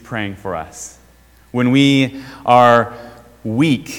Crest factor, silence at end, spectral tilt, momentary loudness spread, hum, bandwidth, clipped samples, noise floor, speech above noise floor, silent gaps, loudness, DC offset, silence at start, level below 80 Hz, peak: 16 dB; 0 s; -5.5 dB/octave; 20 LU; none; 16 kHz; 0.2%; -48 dBFS; 33 dB; none; -15 LUFS; under 0.1%; 0.1 s; -50 dBFS; 0 dBFS